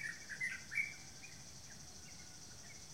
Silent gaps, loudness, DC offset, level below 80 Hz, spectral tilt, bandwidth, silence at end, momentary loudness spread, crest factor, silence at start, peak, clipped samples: none; -45 LUFS; 0.1%; -70 dBFS; -1 dB/octave; 16 kHz; 0 s; 13 LU; 22 dB; 0 s; -26 dBFS; under 0.1%